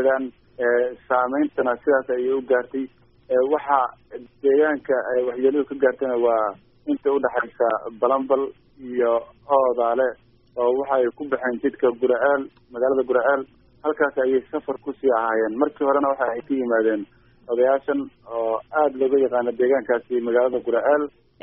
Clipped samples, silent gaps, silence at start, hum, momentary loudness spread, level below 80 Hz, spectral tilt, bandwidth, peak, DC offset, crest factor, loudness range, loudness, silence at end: under 0.1%; none; 0 s; none; 8 LU; -62 dBFS; -3.5 dB/octave; 3.7 kHz; -4 dBFS; under 0.1%; 18 dB; 1 LU; -22 LUFS; 0.35 s